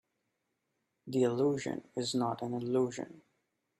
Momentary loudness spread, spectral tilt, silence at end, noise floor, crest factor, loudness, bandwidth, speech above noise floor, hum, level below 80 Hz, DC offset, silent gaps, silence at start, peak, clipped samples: 9 LU; -5.5 dB/octave; 0.6 s; -83 dBFS; 18 dB; -33 LUFS; 14.5 kHz; 50 dB; none; -76 dBFS; under 0.1%; none; 1.05 s; -18 dBFS; under 0.1%